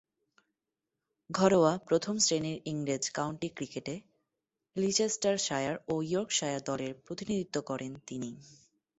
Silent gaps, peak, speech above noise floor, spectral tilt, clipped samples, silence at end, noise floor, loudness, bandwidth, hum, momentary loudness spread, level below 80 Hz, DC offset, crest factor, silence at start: none; -10 dBFS; 57 dB; -4 dB/octave; under 0.1%; 0.55 s; -88 dBFS; -32 LUFS; 8.4 kHz; none; 14 LU; -70 dBFS; under 0.1%; 22 dB; 1.3 s